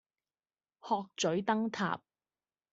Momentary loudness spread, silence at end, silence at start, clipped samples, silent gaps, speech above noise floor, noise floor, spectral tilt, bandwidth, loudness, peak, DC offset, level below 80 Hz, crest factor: 8 LU; 0.75 s; 0.85 s; under 0.1%; none; over 57 dB; under -90 dBFS; -3.5 dB/octave; 8 kHz; -34 LUFS; -16 dBFS; under 0.1%; -76 dBFS; 20 dB